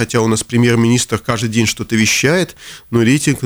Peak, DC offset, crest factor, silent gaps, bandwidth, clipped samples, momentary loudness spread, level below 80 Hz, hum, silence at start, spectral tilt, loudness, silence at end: -2 dBFS; under 0.1%; 12 dB; none; over 20 kHz; under 0.1%; 6 LU; -44 dBFS; none; 0 s; -4.5 dB/octave; -14 LUFS; 0 s